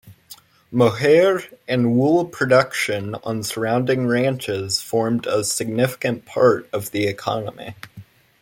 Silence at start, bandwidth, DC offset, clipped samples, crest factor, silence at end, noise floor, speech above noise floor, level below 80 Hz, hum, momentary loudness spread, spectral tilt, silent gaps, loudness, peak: 0.05 s; 17 kHz; under 0.1%; under 0.1%; 18 dB; 0.4 s; -46 dBFS; 27 dB; -60 dBFS; none; 10 LU; -5 dB/octave; none; -20 LUFS; -2 dBFS